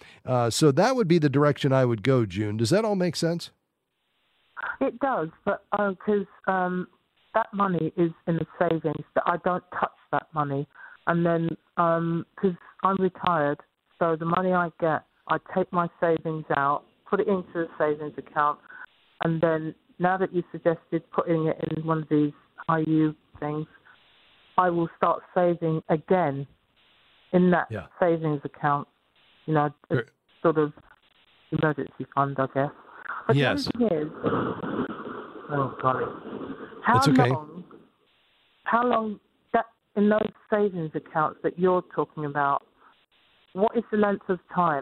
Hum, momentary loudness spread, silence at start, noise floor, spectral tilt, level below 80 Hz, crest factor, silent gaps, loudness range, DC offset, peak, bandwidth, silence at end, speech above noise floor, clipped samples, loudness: none; 11 LU; 0.25 s; -77 dBFS; -6.5 dB/octave; -64 dBFS; 22 dB; none; 3 LU; under 0.1%; -4 dBFS; 13.5 kHz; 0 s; 52 dB; under 0.1%; -26 LUFS